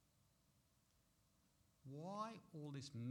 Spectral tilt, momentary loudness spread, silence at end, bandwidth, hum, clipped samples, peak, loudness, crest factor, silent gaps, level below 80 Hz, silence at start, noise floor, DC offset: -6 dB/octave; 8 LU; 0 s; 19 kHz; none; under 0.1%; -36 dBFS; -53 LUFS; 18 dB; none; -86 dBFS; 1.85 s; -79 dBFS; under 0.1%